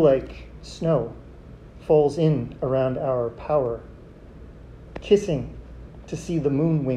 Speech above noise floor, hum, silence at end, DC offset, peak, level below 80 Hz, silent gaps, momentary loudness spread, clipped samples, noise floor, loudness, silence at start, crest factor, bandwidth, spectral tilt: 22 dB; none; 0 s; under 0.1%; -6 dBFS; -44 dBFS; none; 25 LU; under 0.1%; -44 dBFS; -23 LUFS; 0 s; 18 dB; 10 kHz; -8 dB/octave